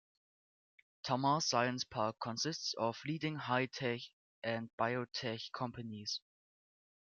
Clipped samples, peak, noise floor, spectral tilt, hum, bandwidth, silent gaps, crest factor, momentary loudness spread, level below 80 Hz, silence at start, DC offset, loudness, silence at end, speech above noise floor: under 0.1%; -18 dBFS; under -90 dBFS; -4 dB/octave; none; 7.4 kHz; 4.13-4.42 s, 4.73-4.78 s; 20 dB; 10 LU; -78 dBFS; 1.05 s; under 0.1%; -38 LUFS; 0.85 s; over 52 dB